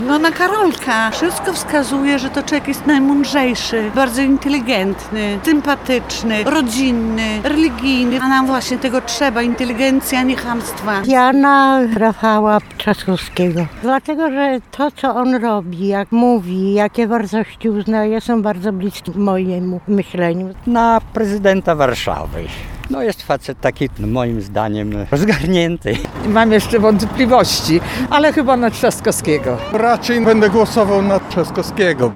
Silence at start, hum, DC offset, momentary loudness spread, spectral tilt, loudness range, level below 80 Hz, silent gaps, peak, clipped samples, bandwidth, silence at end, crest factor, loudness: 0 s; none; under 0.1%; 8 LU; -5 dB/octave; 4 LU; -36 dBFS; none; 0 dBFS; under 0.1%; 18.5 kHz; 0 s; 14 dB; -15 LUFS